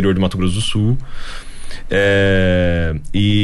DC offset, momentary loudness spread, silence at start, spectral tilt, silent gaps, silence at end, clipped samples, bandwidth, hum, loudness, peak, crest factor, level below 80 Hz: under 0.1%; 19 LU; 0 s; -6 dB/octave; none; 0 s; under 0.1%; 11.5 kHz; none; -16 LUFS; -4 dBFS; 12 dB; -28 dBFS